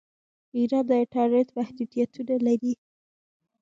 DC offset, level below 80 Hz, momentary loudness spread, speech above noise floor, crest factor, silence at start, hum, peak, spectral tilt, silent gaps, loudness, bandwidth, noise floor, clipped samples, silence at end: under 0.1%; -76 dBFS; 8 LU; over 66 dB; 16 dB; 0.55 s; none; -12 dBFS; -7 dB/octave; none; -26 LUFS; 7.4 kHz; under -90 dBFS; under 0.1%; 0.9 s